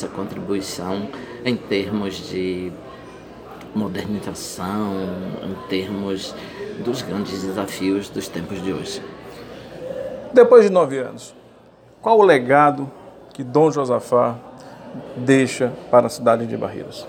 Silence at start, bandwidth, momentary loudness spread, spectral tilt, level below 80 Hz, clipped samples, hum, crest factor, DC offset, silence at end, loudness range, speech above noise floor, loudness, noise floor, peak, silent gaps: 0 s; 17 kHz; 22 LU; -5.5 dB/octave; -56 dBFS; under 0.1%; none; 20 dB; under 0.1%; 0 s; 11 LU; 29 dB; -20 LUFS; -48 dBFS; 0 dBFS; none